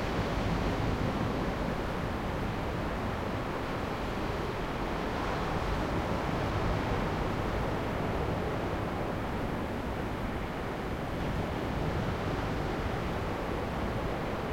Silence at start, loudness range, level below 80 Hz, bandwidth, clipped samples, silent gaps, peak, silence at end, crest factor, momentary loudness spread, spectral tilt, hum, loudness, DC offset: 0 s; 2 LU; -40 dBFS; 16.5 kHz; under 0.1%; none; -18 dBFS; 0 s; 14 dB; 3 LU; -6.5 dB/octave; none; -33 LUFS; under 0.1%